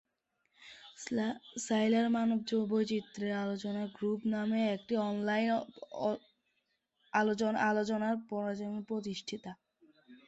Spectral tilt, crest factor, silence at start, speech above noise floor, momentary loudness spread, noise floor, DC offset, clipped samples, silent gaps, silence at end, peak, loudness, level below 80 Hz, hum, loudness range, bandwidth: -5 dB/octave; 18 dB; 0.6 s; 48 dB; 12 LU; -81 dBFS; under 0.1%; under 0.1%; none; 0.1 s; -16 dBFS; -34 LUFS; -76 dBFS; none; 2 LU; 8.2 kHz